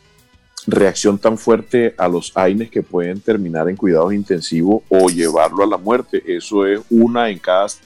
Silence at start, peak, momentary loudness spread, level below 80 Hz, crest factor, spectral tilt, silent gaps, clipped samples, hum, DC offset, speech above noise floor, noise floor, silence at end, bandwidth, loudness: 0.55 s; -2 dBFS; 6 LU; -54 dBFS; 14 dB; -5.5 dB/octave; none; under 0.1%; none; under 0.1%; 37 dB; -52 dBFS; 0.1 s; 12.5 kHz; -16 LUFS